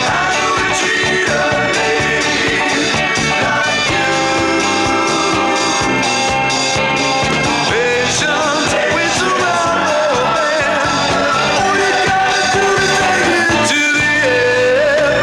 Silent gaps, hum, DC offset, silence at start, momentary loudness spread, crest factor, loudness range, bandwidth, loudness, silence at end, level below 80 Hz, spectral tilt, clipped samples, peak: none; none; under 0.1%; 0 s; 2 LU; 10 dB; 1 LU; 15 kHz; -13 LUFS; 0 s; -40 dBFS; -3 dB/octave; under 0.1%; -4 dBFS